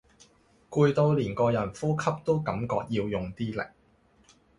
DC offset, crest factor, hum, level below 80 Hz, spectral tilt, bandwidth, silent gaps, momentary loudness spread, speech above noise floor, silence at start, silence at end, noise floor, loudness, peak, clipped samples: under 0.1%; 20 dB; none; -56 dBFS; -7.5 dB/octave; 11 kHz; none; 9 LU; 36 dB; 0.7 s; 0.9 s; -63 dBFS; -28 LUFS; -10 dBFS; under 0.1%